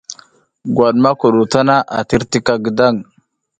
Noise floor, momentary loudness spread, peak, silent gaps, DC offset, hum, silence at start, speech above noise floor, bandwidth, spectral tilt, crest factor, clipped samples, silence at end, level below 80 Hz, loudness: -48 dBFS; 9 LU; 0 dBFS; none; under 0.1%; none; 0.1 s; 34 dB; 9.6 kHz; -5.5 dB/octave; 14 dB; under 0.1%; 0.6 s; -46 dBFS; -14 LUFS